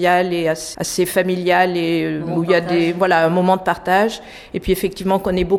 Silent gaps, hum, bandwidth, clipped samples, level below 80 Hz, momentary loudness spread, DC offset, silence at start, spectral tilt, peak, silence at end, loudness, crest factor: none; none; 18 kHz; under 0.1%; -42 dBFS; 6 LU; under 0.1%; 0 s; -5 dB/octave; -2 dBFS; 0 s; -17 LUFS; 14 dB